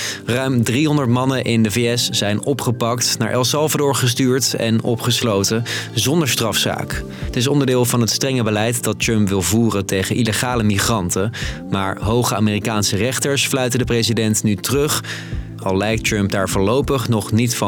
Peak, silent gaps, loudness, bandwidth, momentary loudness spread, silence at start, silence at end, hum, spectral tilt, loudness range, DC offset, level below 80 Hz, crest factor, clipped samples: -6 dBFS; none; -18 LUFS; 19 kHz; 5 LU; 0 s; 0 s; none; -4.5 dB/octave; 1 LU; under 0.1%; -40 dBFS; 12 dB; under 0.1%